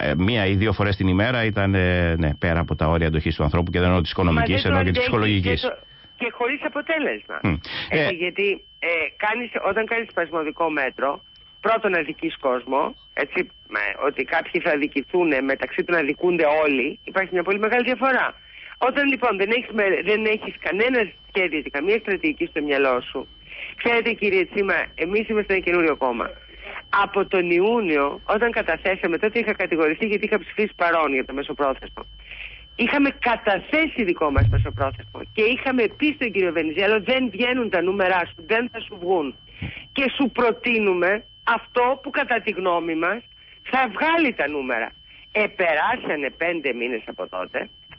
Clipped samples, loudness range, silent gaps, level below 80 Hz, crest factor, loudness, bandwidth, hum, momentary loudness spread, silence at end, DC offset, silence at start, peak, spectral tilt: under 0.1%; 3 LU; none; -38 dBFS; 14 dB; -22 LUFS; 5.8 kHz; none; 8 LU; 0.05 s; under 0.1%; 0 s; -8 dBFS; -10.5 dB/octave